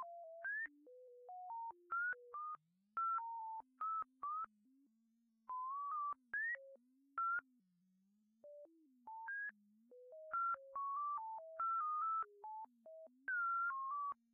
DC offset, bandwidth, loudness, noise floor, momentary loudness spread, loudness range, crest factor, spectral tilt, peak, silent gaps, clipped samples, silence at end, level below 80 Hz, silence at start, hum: under 0.1%; 2.9 kHz; -44 LUFS; -80 dBFS; 19 LU; 6 LU; 12 dB; 7.5 dB/octave; -34 dBFS; none; under 0.1%; 0.2 s; under -90 dBFS; 0 s; none